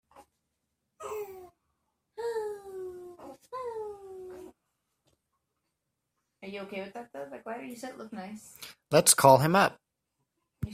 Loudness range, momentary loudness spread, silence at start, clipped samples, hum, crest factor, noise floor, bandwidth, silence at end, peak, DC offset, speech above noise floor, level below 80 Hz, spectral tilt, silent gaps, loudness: 19 LU; 26 LU; 0.2 s; under 0.1%; none; 26 dB; -83 dBFS; 16 kHz; 0 s; -6 dBFS; under 0.1%; 56 dB; -66 dBFS; -3.5 dB/octave; none; -26 LUFS